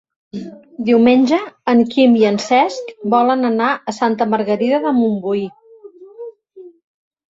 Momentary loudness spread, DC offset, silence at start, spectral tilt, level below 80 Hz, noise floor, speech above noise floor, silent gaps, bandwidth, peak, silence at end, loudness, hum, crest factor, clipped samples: 19 LU; under 0.1%; 0.35 s; -5.5 dB/octave; -62 dBFS; -41 dBFS; 26 dB; none; 7.8 kHz; -2 dBFS; 0.7 s; -15 LUFS; none; 14 dB; under 0.1%